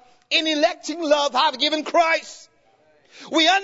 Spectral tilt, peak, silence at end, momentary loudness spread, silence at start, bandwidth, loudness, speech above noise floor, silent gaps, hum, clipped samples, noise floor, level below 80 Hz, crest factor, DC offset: -0.5 dB/octave; -4 dBFS; 0 s; 6 LU; 0.3 s; 8 kHz; -20 LUFS; 38 dB; none; none; under 0.1%; -58 dBFS; -72 dBFS; 16 dB; under 0.1%